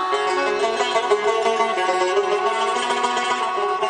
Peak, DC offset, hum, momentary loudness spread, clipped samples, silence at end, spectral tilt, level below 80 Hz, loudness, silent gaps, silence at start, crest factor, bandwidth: -4 dBFS; under 0.1%; none; 2 LU; under 0.1%; 0 s; -1.5 dB/octave; -66 dBFS; -20 LUFS; none; 0 s; 16 dB; 10.5 kHz